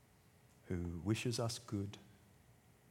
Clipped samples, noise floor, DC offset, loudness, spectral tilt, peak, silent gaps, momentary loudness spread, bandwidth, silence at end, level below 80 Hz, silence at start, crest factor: under 0.1%; -68 dBFS; under 0.1%; -42 LUFS; -5.5 dB/octave; -24 dBFS; none; 9 LU; 17 kHz; 0.4 s; -64 dBFS; 0.65 s; 20 dB